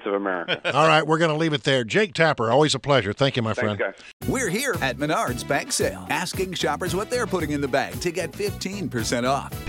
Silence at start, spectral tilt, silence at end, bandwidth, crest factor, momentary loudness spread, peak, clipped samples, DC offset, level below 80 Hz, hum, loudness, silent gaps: 0 s; -4.5 dB/octave; 0 s; 17 kHz; 20 dB; 8 LU; -4 dBFS; under 0.1%; under 0.1%; -48 dBFS; none; -23 LUFS; 4.13-4.20 s